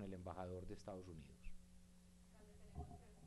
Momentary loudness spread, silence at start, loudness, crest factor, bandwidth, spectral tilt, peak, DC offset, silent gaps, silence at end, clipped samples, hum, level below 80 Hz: 16 LU; 0 s; -55 LUFS; 18 dB; 12 kHz; -7 dB/octave; -36 dBFS; under 0.1%; none; 0 s; under 0.1%; none; -62 dBFS